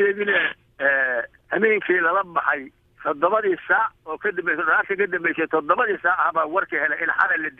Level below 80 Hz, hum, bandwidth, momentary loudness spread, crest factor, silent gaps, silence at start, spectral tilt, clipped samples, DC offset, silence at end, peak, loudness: -64 dBFS; none; 4.3 kHz; 7 LU; 18 dB; none; 0 s; -7 dB/octave; under 0.1%; under 0.1%; 0.1 s; -4 dBFS; -21 LUFS